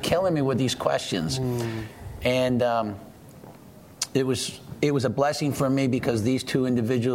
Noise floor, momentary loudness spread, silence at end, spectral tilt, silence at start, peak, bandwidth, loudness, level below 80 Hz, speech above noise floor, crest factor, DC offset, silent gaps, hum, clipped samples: -47 dBFS; 9 LU; 0 s; -5.5 dB/octave; 0 s; -6 dBFS; 16 kHz; -25 LUFS; -52 dBFS; 23 dB; 20 dB; under 0.1%; none; none; under 0.1%